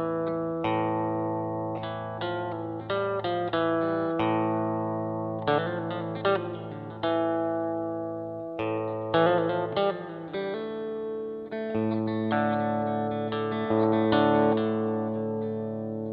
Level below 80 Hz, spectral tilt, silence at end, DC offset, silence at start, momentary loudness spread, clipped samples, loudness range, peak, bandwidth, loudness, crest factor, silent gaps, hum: -64 dBFS; -10 dB/octave; 0 s; under 0.1%; 0 s; 10 LU; under 0.1%; 4 LU; -10 dBFS; 5 kHz; -28 LUFS; 18 dB; none; none